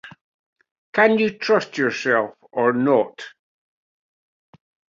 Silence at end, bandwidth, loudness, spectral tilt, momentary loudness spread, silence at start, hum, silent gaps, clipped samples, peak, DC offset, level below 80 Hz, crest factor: 1.6 s; 7.6 kHz; -20 LUFS; -5.5 dB/octave; 11 LU; 0.05 s; none; 0.21-0.56 s, 0.71-0.93 s; under 0.1%; -2 dBFS; under 0.1%; -68 dBFS; 20 dB